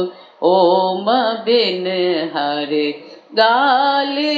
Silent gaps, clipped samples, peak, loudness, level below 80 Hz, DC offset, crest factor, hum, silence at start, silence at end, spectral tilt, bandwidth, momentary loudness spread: none; under 0.1%; -2 dBFS; -16 LUFS; -76 dBFS; under 0.1%; 14 dB; none; 0 s; 0 s; -6 dB/octave; 7.6 kHz; 7 LU